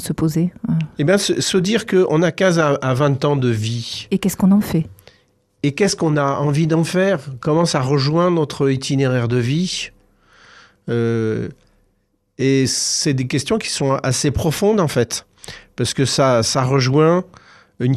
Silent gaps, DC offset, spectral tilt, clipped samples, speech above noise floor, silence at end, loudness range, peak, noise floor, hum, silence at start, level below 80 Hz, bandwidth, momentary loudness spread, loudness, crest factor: none; under 0.1%; -5 dB/octave; under 0.1%; 48 dB; 0 s; 4 LU; -4 dBFS; -65 dBFS; none; 0 s; -46 dBFS; 13.5 kHz; 8 LU; -18 LUFS; 14 dB